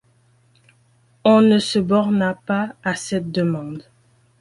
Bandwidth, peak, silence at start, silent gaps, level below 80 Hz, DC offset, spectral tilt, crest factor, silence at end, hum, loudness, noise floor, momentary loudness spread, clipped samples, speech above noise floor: 11.5 kHz; -2 dBFS; 1.25 s; none; -58 dBFS; under 0.1%; -6 dB/octave; 18 dB; 0.6 s; none; -19 LUFS; -58 dBFS; 12 LU; under 0.1%; 40 dB